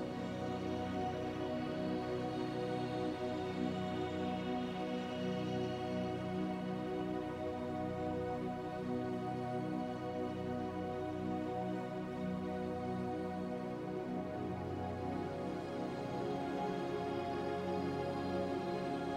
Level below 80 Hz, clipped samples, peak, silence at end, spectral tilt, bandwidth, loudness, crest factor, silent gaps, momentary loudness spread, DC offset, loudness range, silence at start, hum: -66 dBFS; under 0.1%; -26 dBFS; 0 s; -7 dB/octave; 13 kHz; -40 LUFS; 14 dB; none; 3 LU; under 0.1%; 2 LU; 0 s; none